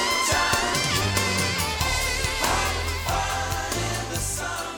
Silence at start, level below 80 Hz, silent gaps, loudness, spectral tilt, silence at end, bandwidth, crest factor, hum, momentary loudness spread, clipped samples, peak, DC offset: 0 s; -36 dBFS; none; -24 LUFS; -2.5 dB/octave; 0 s; 19 kHz; 18 dB; none; 6 LU; under 0.1%; -8 dBFS; under 0.1%